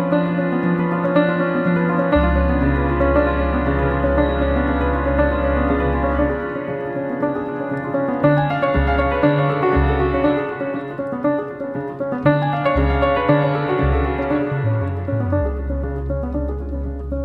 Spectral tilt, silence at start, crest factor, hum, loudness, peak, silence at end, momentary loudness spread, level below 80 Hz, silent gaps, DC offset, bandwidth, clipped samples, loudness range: -10 dB/octave; 0 s; 16 dB; none; -19 LUFS; -2 dBFS; 0 s; 8 LU; -26 dBFS; none; under 0.1%; 4.8 kHz; under 0.1%; 3 LU